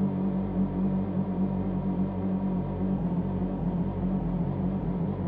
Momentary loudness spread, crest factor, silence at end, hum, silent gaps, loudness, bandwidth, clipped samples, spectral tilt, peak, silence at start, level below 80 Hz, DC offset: 2 LU; 10 dB; 0 s; none; none; -29 LUFS; 3.7 kHz; under 0.1%; -13 dB/octave; -18 dBFS; 0 s; -42 dBFS; under 0.1%